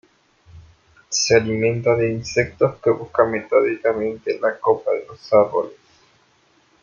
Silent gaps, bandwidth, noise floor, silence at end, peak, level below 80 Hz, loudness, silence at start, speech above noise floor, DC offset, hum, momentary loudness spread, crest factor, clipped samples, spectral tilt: none; 7.4 kHz; -59 dBFS; 1.1 s; -2 dBFS; -54 dBFS; -20 LUFS; 0.55 s; 40 dB; under 0.1%; none; 8 LU; 18 dB; under 0.1%; -4.5 dB/octave